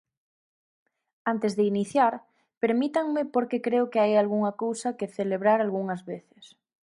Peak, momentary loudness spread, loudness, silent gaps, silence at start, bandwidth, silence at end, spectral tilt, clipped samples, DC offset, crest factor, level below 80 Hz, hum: -10 dBFS; 10 LU; -26 LUFS; 2.57-2.61 s; 1.25 s; 11.5 kHz; 0.4 s; -6 dB/octave; under 0.1%; under 0.1%; 18 dB; -78 dBFS; none